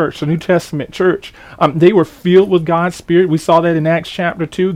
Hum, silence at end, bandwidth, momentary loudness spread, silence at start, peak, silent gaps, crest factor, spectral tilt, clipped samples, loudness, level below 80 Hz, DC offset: none; 0 s; 13.5 kHz; 8 LU; 0 s; 0 dBFS; none; 14 dB; -7 dB/octave; under 0.1%; -14 LUFS; -48 dBFS; under 0.1%